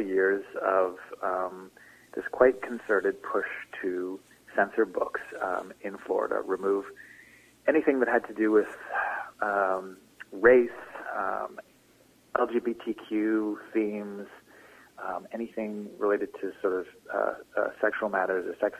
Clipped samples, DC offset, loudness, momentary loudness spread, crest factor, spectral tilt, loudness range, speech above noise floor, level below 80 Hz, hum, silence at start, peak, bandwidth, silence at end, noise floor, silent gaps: under 0.1%; under 0.1%; -29 LUFS; 15 LU; 22 dB; -6.5 dB/octave; 6 LU; 32 dB; -68 dBFS; none; 0 s; -6 dBFS; 15 kHz; 0 s; -61 dBFS; none